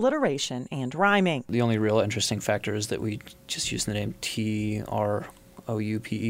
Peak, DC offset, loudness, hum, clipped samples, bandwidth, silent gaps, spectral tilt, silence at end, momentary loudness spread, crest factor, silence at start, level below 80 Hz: -10 dBFS; under 0.1%; -27 LUFS; none; under 0.1%; 16 kHz; none; -4.5 dB/octave; 0 s; 10 LU; 18 dB; 0 s; -56 dBFS